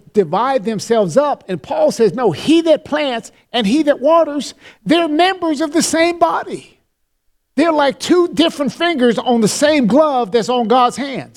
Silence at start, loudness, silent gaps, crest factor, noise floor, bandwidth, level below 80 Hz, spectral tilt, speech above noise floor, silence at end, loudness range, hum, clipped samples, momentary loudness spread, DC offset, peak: 0.15 s; -15 LUFS; none; 14 dB; -65 dBFS; 15.5 kHz; -56 dBFS; -4.5 dB/octave; 50 dB; 0.1 s; 3 LU; none; under 0.1%; 9 LU; under 0.1%; 0 dBFS